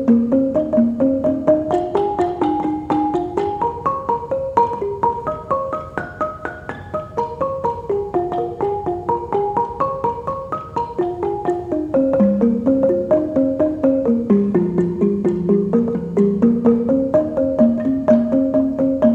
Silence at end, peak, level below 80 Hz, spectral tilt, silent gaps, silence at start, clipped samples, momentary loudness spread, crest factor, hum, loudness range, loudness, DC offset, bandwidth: 0 s; 0 dBFS; -46 dBFS; -9.5 dB/octave; none; 0 s; under 0.1%; 9 LU; 16 dB; none; 6 LU; -19 LUFS; under 0.1%; 8 kHz